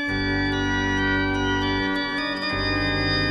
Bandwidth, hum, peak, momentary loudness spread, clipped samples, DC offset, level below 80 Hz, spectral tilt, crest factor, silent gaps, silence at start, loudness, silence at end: 10.5 kHz; none; -10 dBFS; 3 LU; under 0.1%; under 0.1%; -36 dBFS; -5 dB/octave; 12 dB; none; 0 s; -23 LUFS; 0 s